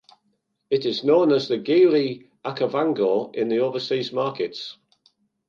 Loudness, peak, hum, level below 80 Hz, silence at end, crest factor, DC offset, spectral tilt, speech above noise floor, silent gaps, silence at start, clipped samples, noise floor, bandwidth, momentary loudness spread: -22 LUFS; -6 dBFS; none; -76 dBFS; 0.75 s; 16 dB; under 0.1%; -6.5 dB/octave; 50 dB; none; 0.7 s; under 0.1%; -71 dBFS; 7.2 kHz; 11 LU